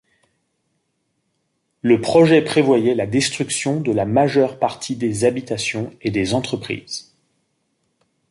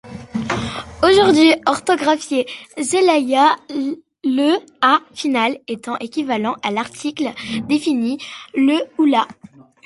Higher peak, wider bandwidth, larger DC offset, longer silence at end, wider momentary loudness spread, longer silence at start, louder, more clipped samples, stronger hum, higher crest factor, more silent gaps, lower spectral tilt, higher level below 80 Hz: about the same, -2 dBFS vs -2 dBFS; about the same, 11.5 kHz vs 11.5 kHz; neither; first, 1.3 s vs 0.55 s; about the same, 12 LU vs 13 LU; first, 1.85 s vs 0.05 s; about the same, -18 LUFS vs -18 LUFS; neither; neither; about the same, 18 dB vs 16 dB; neither; about the same, -5 dB/octave vs -4 dB/octave; about the same, -54 dBFS vs -50 dBFS